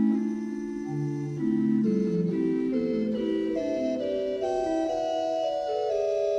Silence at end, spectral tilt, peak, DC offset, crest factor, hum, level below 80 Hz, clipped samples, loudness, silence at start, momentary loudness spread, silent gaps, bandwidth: 0 s; -7.5 dB/octave; -14 dBFS; under 0.1%; 12 dB; none; -60 dBFS; under 0.1%; -28 LUFS; 0 s; 6 LU; none; 9.2 kHz